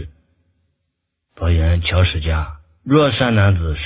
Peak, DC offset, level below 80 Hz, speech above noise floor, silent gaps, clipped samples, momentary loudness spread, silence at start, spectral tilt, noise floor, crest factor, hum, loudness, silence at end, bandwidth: 0 dBFS; under 0.1%; -24 dBFS; 59 dB; none; under 0.1%; 13 LU; 0 s; -11 dB/octave; -74 dBFS; 16 dB; none; -17 LUFS; 0 s; 4 kHz